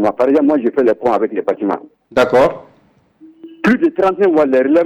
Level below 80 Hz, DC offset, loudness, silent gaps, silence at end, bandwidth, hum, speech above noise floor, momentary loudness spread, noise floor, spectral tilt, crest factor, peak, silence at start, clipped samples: -52 dBFS; under 0.1%; -14 LUFS; none; 0 s; 11.5 kHz; none; 40 dB; 8 LU; -53 dBFS; -7 dB/octave; 10 dB; -4 dBFS; 0 s; under 0.1%